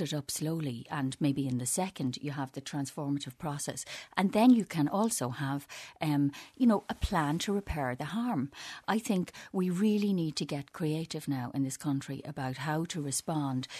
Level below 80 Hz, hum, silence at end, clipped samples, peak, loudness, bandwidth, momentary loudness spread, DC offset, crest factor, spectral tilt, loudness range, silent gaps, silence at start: -52 dBFS; none; 0 s; under 0.1%; -10 dBFS; -32 LUFS; 13.5 kHz; 9 LU; under 0.1%; 22 dB; -5 dB/octave; 5 LU; none; 0 s